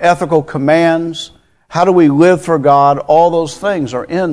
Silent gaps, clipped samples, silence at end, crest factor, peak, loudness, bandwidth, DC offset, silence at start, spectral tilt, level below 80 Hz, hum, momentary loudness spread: none; 0.3%; 0 s; 12 dB; 0 dBFS; -12 LUFS; 11 kHz; under 0.1%; 0 s; -6.5 dB/octave; -50 dBFS; none; 10 LU